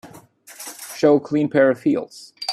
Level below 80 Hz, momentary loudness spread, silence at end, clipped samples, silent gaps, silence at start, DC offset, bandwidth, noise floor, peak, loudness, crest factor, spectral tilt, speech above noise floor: -66 dBFS; 18 LU; 0 s; under 0.1%; none; 0.05 s; under 0.1%; 14.5 kHz; -45 dBFS; -2 dBFS; -19 LUFS; 18 dB; -5 dB/octave; 27 dB